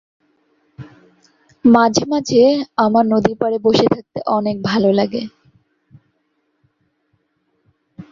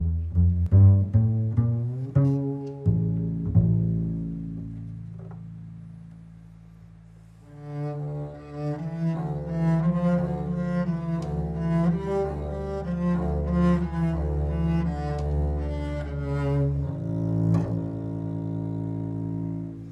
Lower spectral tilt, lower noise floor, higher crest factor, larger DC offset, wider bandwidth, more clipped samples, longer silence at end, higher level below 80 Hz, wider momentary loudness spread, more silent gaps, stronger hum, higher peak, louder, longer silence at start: second, -5.5 dB/octave vs -10.5 dB/octave; first, -67 dBFS vs -49 dBFS; about the same, 18 dB vs 18 dB; neither; first, 7.6 kHz vs 6 kHz; neither; about the same, 0.1 s vs 0 s; second, -54 dBFS vs -36 dBFS; second, 8 LU vs 14 LU; neither; neither; first, 0 dBFS vs -8 dBFS; first, -16 LUFS vs -26 LUFS; first, 0.8 s vs 0 s